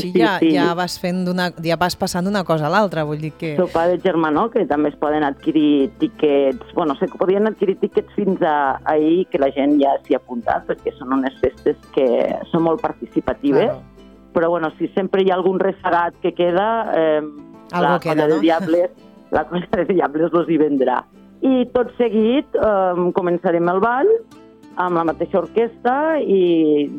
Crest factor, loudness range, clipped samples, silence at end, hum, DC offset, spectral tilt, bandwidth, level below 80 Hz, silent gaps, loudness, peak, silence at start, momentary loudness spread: 16 dB; 2 LU; under 0.1%; 0 s; none; under 0.1%; -6.5 dB/octave; 16.5 kHz; -52 dBFS; none; -18 LUFS; -2 dBFS; 0 s; 6 LU